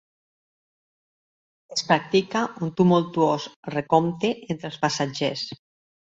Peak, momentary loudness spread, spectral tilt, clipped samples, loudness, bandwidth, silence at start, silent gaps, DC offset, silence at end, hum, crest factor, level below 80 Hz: -4 dBFS; 11 LU; -5.5 dB/octave; under 0.1%; -24 LUFS; 7.8 kHz; 1.7 s; 3.56-3.63 s; under 0.1%; 0.5 s; none; 22 dB; -66 dBFS